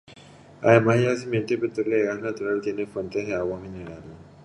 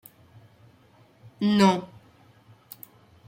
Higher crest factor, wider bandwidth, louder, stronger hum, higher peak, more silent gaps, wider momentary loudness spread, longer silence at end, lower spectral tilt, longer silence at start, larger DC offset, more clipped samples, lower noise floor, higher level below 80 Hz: about the same, 24 dB vs 20 dB; second, 11 kHz vs 16.5 kHz; about the same, -24 LUFS vs -23 LUFS; neither; first, -2 dBFS vs -8 dBFS; neither; second, 18 LU vs 27 LU; second, 0.15 s vs 1.4 s; about the same, -7 dB/octave vs -6 dB/octave; second, 0.1 s vs 1.4 s; neither; neither; second, -48 dBFS vs -58 dBFS; first, -56 dBFS vs -70 dBFS